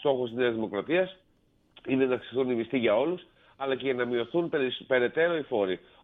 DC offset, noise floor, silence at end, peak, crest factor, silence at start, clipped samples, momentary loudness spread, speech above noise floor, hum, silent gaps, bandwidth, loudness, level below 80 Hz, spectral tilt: under 0.1%; -61 dBFS; 0.25 s; -12 dBFS; 16 dB; 0 s; under 0.1%; 6 LU; 33 dB; none; none; 4 kHz; -28 LUFS; -68 dBFS; -8.5 dB/octave